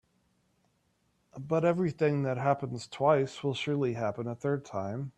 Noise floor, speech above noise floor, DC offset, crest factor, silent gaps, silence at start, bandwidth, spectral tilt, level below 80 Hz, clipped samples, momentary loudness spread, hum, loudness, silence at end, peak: -73 dBFS; 43 dB; under 0.1%; 20 dB; none; 1.35 s; 9 kHz; -7 dB/octave; -70 dBFS; under 0.1%; 8 LU; none; -30 LUFS; 0.1 s; -12 dBFS